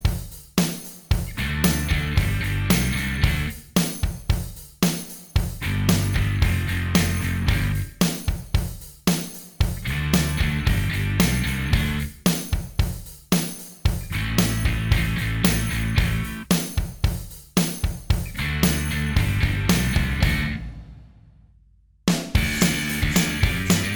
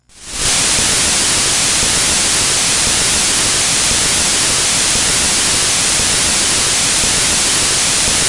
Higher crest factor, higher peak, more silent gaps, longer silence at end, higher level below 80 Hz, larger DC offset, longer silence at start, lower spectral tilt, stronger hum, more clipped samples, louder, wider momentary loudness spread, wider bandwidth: first, 20 dB vs 12 dB; about the same, -2 dBFS vs -2 dBFS; neither; about the same, 0 s vs 0 s; about the same, -28 dBFS vs -32 dBFS; neither; second, 0 s vs 0.15 s; first, -4.5 dB/octave vs -0.5 dB/octave; neither; neither; second, -23 LUFS vs -10 LUFS; first, 6 LU vs 0 LU; first, over 20 kHz vs 11.5 kHz